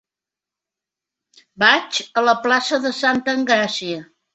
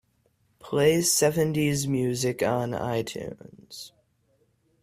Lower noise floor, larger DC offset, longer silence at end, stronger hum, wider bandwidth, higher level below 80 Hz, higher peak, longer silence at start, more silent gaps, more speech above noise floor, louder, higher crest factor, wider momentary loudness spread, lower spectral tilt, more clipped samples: first, -88 dBFS vs -68 dBFS; neither; second, 0.3 s vs 0.95 s; neither; second, 8.2 kHz vs 16 kHz; second, -66 dBFS vs -60 dBFS; first, -2 dBFS vs -8 dBFS; first, 1.6 s vs 0.65 s; neither; first, 70 dB vs 43 dB; first, -18 LUFS vs -25 LUFS; about the same, 20 dB vs 18 dB; second, 9 LU vs 21 LU; second, -2.5 dB/octave vs -4.5 dB/octave; neither